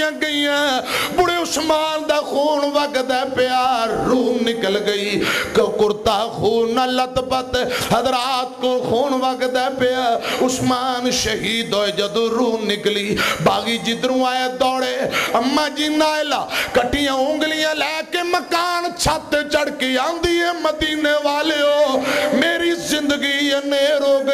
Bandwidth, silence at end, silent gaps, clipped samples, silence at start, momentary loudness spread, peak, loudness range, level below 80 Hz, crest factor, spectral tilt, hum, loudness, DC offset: 15.5 kHz; 0 s; none; under 0.1%; 0 s; 3 LU; -6 dBFS; 1 LU; -46 dBFS; 12 dB; -3.5 dB/octave; none; -18 LUFS; under 0.1%